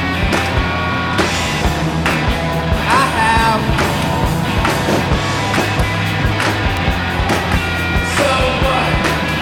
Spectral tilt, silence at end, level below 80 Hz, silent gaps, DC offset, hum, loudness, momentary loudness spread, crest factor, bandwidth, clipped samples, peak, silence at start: -5 dB/octave; 0 s; -24 dBFS; none; under 0.1%; none; -15 LUFS; 4 LU; 14 dB; 18 kHz; under 0.1%; 0 dBFS; 0 s